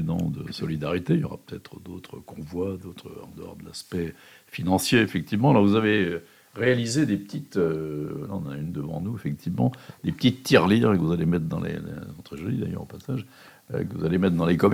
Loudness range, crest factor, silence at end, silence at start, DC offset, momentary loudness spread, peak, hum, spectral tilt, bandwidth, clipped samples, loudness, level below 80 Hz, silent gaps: 8 LU; 22 dB; 0 s; 0 s; under 0.1%; 20 LU; -4 dBFS; none; -6 dB/octave; 16 kHz; under 0.1%; -25 LUFS; -54 dBFS; none